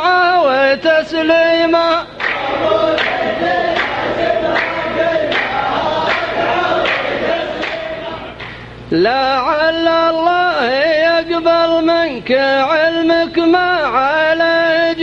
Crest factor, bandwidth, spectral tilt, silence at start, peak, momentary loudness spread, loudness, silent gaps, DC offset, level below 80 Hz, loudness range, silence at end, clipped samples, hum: 14 dB; 7.8 kHz; -5 dB/octave; 0 s; 0 dBFS; 6 LU; -14 LUFS; none; under 0.1%; -44 dBFS; 4 LU; 0 s; under 0.1%; 50 Hz at -45 dBFS